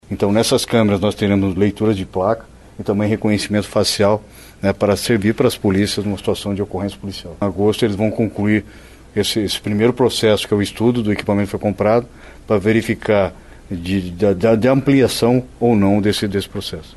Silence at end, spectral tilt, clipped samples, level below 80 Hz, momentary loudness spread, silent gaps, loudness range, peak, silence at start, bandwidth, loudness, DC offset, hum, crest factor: 0.05 s; -5.5 dB/octave; under 0.1%; -42 dBFS; 8 LU; none; 3 LU; -2 dBFS; 0.1 s; 12.5 kHz; -17 LUFS; under 0.1%; none; 14 dB